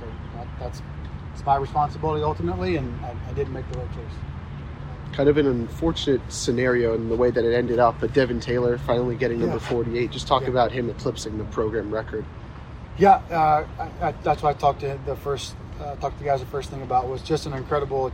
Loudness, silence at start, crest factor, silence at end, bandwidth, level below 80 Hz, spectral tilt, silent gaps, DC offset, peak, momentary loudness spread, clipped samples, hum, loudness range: -24 LUFS; 0 s; 20 dB; 0 s; 16 kHz; -40 dBFS; -6 dB/octave; none; under 0.1%; -4 dBFS; 15 LU; under 0.1%; none; 5 LU